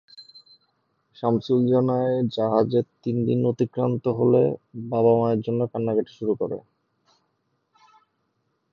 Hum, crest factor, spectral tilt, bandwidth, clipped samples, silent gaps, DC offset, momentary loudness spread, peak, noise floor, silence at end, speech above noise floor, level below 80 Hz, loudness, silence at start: none; 18 dB; -10 dB/octave; 6.6 kHz; under 0.1%; none; under 0.1%; 8 LU; -6 dBFS; -73 dBFS; 2.15 s; 51 dB; -66 dBFS; -23 LUFS; 0.2 s